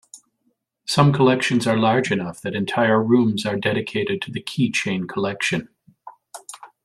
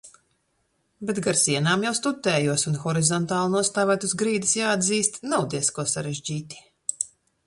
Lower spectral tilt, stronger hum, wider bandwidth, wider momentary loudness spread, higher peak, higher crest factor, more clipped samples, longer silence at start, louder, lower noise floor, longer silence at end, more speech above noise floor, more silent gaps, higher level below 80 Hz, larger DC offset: first, -5.5 dB/octave vs -3.5 dB/octave; neither; first, 13 kHz vs 11.5 kHz; first, 14 LU vs 11 LU; about the same, -2 dBFS vs -2 dBFS; about the same, 18 dB vs 22 dB; neither; about the same, 0.15 s vs 0.05 s; first, -20 LUFS vs -23 LUFS; about the same, -70 dBFS vs -71 dBFS; second, 0.2 s vs 0.4 s; about the same, 50 dB vs 47 dB; neither; about the same, -60 dBFS vs -64 dBFS; neither